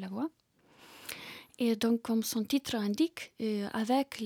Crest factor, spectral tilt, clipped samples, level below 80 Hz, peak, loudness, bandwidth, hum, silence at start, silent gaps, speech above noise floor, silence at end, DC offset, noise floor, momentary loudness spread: 14 dB; -4.5 dB/octave; under 0.1%; -74 dBFS; -18 dBFS; -33 LUFS; 19.5 kHz; none; 0 s; none; 28 dB; 0 s; under 0.1%; -60 dBFS; 13 LU